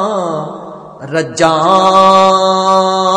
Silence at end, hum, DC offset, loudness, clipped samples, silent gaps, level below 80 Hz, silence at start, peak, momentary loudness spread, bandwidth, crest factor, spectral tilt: 0 s; none; under 0.1%; -10 LUFS; 0.7%; none; -54 dBFS; 0 s; 0 dBFS; 19 LU; 10 kHz; 10 dB; -4.5 dB/octave